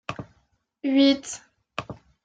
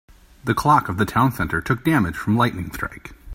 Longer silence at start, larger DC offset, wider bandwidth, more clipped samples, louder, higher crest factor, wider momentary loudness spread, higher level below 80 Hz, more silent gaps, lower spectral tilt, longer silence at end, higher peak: second, 0.1 s vs 0.45 s; neither; second, 9.4 kHz vs 16.5 kHz; neither; about the same, -22 LUFS vs -20 LUFS; about the same, 18 dB vs 20 dB; first, 20 LU vs 13 LU; second, -60 dBFS vs -42 dBFS; neither; second, -4 dB/octave vs -6.5 dB/octave; first, 0.3 s vs 0 s; second, -8 dBFS vs -2 dBFS